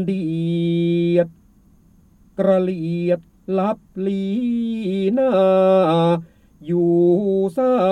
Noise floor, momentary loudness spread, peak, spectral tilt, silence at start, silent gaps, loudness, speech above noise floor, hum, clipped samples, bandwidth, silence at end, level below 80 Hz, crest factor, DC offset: -52 dBFS; 9 LU; -4 dBFS; -9 dB/octave; 0 s; none; -19 LUFS; 34 dB; none; under 0.1%; 9.2 kHz; 0 s; -56 dBFS; 14 dB; under 0.1%